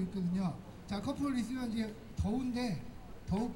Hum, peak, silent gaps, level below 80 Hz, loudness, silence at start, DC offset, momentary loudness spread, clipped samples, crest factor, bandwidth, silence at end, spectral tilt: none; -24 dBFS; none; -52 dBFS; -37 LUFS; 0 s; under 0.1%; 8 LU; under 0.1%; 12 dB; 16 kHz; 0 s; -7 dB/octave